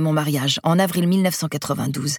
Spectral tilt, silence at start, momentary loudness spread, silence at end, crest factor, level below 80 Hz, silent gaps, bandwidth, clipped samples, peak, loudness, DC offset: -5 dB/octave; 0 s; 6 LU; 0 s; 16 dB; -62 dBFS; none; 19 kHz; under 0.1%; -4 dBFS; -20 LUFS; under 0.1%